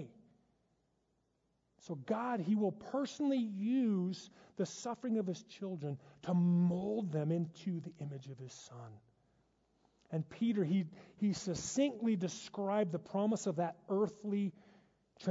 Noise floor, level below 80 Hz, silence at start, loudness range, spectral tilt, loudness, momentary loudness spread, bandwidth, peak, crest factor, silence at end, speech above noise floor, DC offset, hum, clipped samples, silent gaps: -80 dBFS; -76 dBFS; 0 s; 5 LU; -7.5 dB/octave; -37 LUFS; 14 LU; 7.6 kHz; -22 dBFS; 16 dB; 0 s; 43 dB; under 0.1%; none; under 0.1%; none